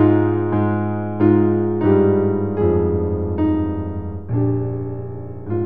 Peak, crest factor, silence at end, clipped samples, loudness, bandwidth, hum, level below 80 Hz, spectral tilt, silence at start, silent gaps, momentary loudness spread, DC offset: -2 dBFS; 16 dB; 0 s; under 0.1%; -19 LUFS; 3.7 kHz; none; -40 dBFS; -13 dB/octave; 0 s; none; 12 LU; 1%